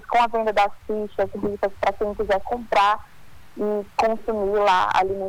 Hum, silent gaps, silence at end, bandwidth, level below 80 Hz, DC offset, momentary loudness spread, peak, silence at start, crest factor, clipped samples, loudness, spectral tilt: none; none; 0 s; 19 kHz; -46 dBFS; under 0.1%; 8 LU; -8 dBFS; 0 s; 14 dB; under 0.1%; -22 LUFS; -4.5 dB/octave